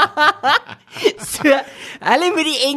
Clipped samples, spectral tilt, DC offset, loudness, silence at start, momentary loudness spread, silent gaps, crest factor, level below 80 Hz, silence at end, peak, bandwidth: under 0.1%; -2 dB/octave; under 0.1%; -16 LUFS; 0 s; 9 LU; none; 16 dB; -58 dBFS; 0 s; -2 dBFS; 13 kHz